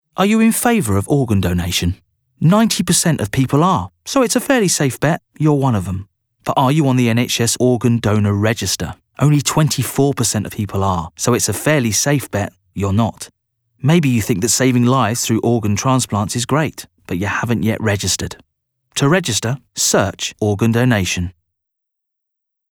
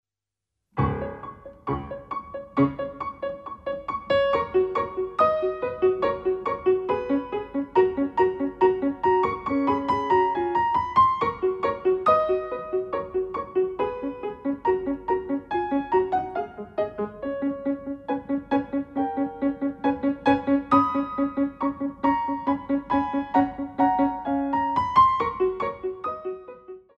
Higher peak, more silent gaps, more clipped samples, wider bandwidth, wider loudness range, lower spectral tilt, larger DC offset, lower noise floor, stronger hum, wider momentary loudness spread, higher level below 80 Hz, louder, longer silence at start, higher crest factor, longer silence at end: first, -2 dBFS vs -6 dBFS; neither; neither; first, 19 kHz vs 6 kHz; about the same, 3 LU vs 5 LU; second, -4.5 dB/octave vs -8.5 dB/octave; neither; second, -78 dBFS vs -88 dBFS; neither; about the same, 9 LU vs 11 LU; first, -44 dBFS vs -52 dBFS; first, -16 LUFS vs -25 LUFS; second, 0.15 s vs 0.75 s; about the same, 14 dB vs 18 dB; first, 1.4 s vs 0.2 s